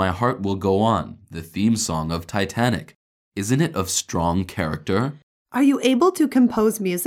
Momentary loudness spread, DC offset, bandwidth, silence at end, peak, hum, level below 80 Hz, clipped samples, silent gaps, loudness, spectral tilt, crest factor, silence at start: 11 LU; under 0.1%; 17 kHz; 0 s; -6 dBFS; none; -48 dBFS; under 0.1%; 2.95-3.32 s, 5.23-5.45 s; -21 LUFS; -5 dB/octave; 16 dB; 0 s